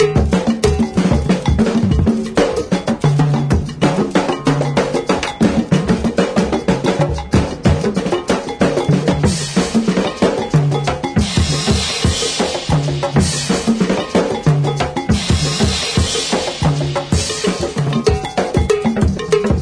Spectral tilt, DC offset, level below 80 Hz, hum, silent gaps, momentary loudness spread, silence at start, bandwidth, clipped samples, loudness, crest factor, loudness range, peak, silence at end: -5.5 dB/octave; under 0.1%; -28 dBFS; none; none; 3 LU; 0 s; 11 kHz; under 0.1%; -16 LUFS; 14 dB; 1 LU; -2 dBFS; 0 s